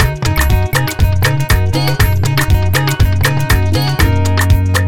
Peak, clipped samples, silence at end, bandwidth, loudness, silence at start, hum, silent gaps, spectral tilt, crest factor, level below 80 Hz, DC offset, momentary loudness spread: 0 dBFS; under 0.1%; 0 s; 17.5 kHz; -13 LUFS; 0 s; none; none; -5 dB/octave; 12 dB; -18 dBFS; 4%; 2 LU